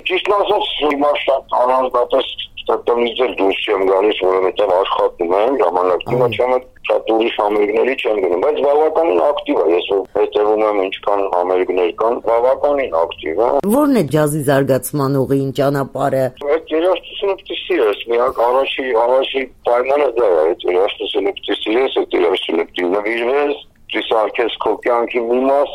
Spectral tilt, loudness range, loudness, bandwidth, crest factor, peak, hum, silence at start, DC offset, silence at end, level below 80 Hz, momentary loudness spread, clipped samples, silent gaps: -5.5 dB/octave; 2 LU; -16 LUFS; 16 kHz; 14 dB; 0 dBFS; none; 0.05 s; under 0.1%; 0 s; -48 dBFS; 5 LU; under 0.1%; none